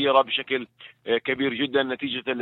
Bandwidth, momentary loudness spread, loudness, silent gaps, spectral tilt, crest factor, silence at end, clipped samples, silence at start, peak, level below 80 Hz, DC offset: 4.2 kHz; 8 LU; -25 LUFS; none; -7 dB/octave; 20 dB; 0 s; under 0.1%; 0 s; -6 dBFS; -70 dBFS; under 0.1%